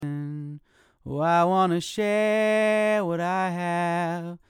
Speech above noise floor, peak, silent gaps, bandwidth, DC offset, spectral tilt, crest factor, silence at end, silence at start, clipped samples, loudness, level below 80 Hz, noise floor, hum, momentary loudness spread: 28 dB; -12 dBFS; none; 16.5 kHz; under 0.1%; -6 dB/octave; 14 dB; 0.15 s; 0 s; under 0.1%; -24 LUFS; -64 dBFS; -51 dBFS; none; 13 LU